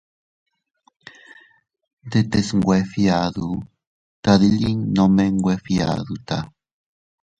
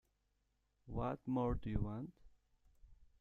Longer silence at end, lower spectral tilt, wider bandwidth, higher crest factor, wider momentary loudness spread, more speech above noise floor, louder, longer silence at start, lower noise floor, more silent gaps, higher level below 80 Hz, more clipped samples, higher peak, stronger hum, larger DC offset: first, 0.95 s vs 0.15 s; second, -6.5 dB/octave vs -10 dB/octave; first, 9 kHz vs 6.8 kHz; about the same, 20 dB vs 22 dB; about the same, 11 LU vs 10 LU; second, 30 dB vs 42 dB; first, -20 LUFS vs -42 LUFS; first, 2.05 s vs 0.85 s; second, -49 dBFS vs -82 dBFS; first, 3.87-4.23 s vs none; first, -46 dBFS vs -54 dBFS; neither; first, 0 dBFS vs -22 dBFS; neither; neither